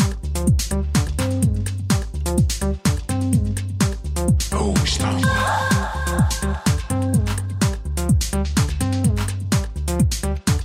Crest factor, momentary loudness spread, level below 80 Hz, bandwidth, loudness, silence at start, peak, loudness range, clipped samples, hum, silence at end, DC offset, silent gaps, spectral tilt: 14 dB; 4 LU; -26 dBFS; 16 kHz; -21 LUFS; 0 s; -6 dBFS; 1 LU; under 0.1%; none; 0 s; under 0.1%; none; -5 dB/octave